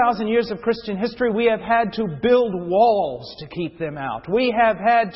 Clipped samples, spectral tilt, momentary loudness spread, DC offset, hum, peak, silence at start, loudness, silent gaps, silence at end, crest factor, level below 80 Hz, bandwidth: under 0.1%; -10 dB/octave; 11 LU; under 0.1%; none; -4 dBFS; 0 s; -20 LUFS; none; 0 s; 16 dB; -52 dBFS; 5.8 kHz